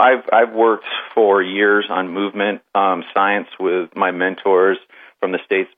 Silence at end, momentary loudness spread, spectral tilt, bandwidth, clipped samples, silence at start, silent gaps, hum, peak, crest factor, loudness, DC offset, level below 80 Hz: 0.1 s; 7 LU; -7.5 dB/octave; 3.9 kHz; under 0.1%; 0 s; none; none; 0 dBFS; 16 dB; -17 LUFS; under 0.1%; -86 dBFS